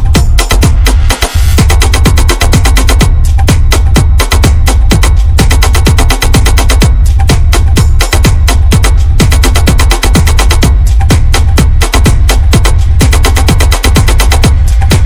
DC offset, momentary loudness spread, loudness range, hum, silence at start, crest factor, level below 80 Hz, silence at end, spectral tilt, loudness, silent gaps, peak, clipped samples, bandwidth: under 0.1%; 1 LU; 0 LU; none; 0 s; 4 dB; -6 dBFS; 0 s; -4.5 dB/octave; -7 LUFS; none; 0 dBFS; 7%; 17.5 kHz